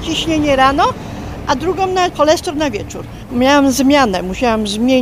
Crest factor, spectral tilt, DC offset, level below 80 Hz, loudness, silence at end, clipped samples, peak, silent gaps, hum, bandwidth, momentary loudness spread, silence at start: 14 dB; -4.5 dB/octave; under 0.1%; -34 dBFS; -14 LUFS; 0 s; under 0.1%; 0 dBFS; none; none; 15.5 kHz; 13 LU; 0 s